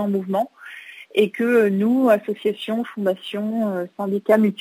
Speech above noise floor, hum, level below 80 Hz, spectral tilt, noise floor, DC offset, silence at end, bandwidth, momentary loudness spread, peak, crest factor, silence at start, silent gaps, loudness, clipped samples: 20 dB; none; -78 dBFS; -7 dB/octave; -40 dBFS; under 0.1%; 0.05 s; 16 kHz; 9 LU; -4 dBFS; 16 dB; 0 s; none; -21 LUFS; under 0.1%